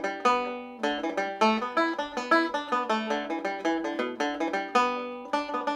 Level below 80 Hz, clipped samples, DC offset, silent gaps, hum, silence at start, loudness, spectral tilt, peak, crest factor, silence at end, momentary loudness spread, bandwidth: -68 dBFS; under 0.1%; under 0.1%; none; none; 0 s; -28 LUFS; -3.5 dB/octave; -10 dBFS; 18 dB; 0 s; 7 LU; 12 kHz